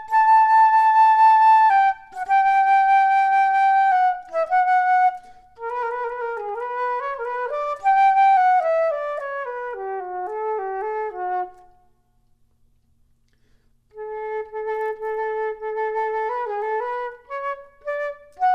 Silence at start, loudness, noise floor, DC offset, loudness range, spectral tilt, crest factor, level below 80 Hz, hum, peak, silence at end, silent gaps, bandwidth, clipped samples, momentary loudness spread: 0 s; -20 LUFS; -61 dBFS; under 0.1%; 16 LU; -2.5 dB/octave; 12 dB; -60 dBFS; none; -8 dBFS; 0 s; none; 8.4 kHz; under 0.1%; 15 LU